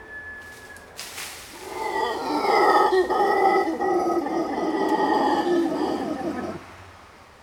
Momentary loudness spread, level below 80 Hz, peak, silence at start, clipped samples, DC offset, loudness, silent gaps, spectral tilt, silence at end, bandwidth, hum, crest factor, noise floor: 19 LU; -58 dBFS; -6 dBFS; 0 s; under 0.1%; under 0.1%; -23 LUFS; none; -4.5 dB/octave; 0.2 s; 18.5 kHz; none; 18 dB; -48 dBFS